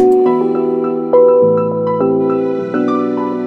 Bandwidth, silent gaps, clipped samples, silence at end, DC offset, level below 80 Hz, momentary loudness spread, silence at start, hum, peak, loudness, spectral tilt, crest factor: 5 kHz; none; under 0.1%; 0 s; under 0.1%; -60 dBFS; 7 LU; 0 s; none; 0 dBFS; -13 LUFS; -9.5 dB/octave; 12 dB